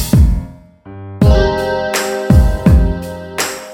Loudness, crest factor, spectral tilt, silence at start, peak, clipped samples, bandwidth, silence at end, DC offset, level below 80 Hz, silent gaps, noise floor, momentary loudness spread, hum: -14 LUFS; 12 dB; -6 dB/octave; 0 s; 0 dBFS; under 0.1%; 17 kHz; 0 s; under 0.1%; -16 dBFS; none; -35 dBFS; 13 LU; none